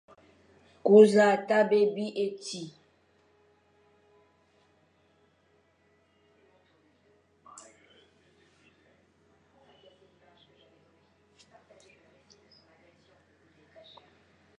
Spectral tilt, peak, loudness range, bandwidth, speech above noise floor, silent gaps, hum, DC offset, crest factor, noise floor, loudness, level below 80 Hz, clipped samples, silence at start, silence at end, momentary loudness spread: -5.5 dB/octave; -6 dBFS; 22 LU; 10.5 kHz; 45 dB; none; none; under 0.1%; 24 dB; -68 dBFS; -24 LUFS; -78 dBFS; under 0.1%; 0.85 s; 11.9 s; 31 LU